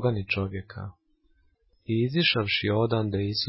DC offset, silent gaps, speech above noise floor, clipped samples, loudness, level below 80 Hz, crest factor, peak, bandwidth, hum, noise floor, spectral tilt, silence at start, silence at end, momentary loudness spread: under 0.1%; none; 39 dB; under 0.1%; -26 LUFS; -50 dBFS; 20 dB; -8 dBFS; 5.8 kHz; none; -65 dBFS; -9.5 dB/octave; 0 s; 0 s; 18 LU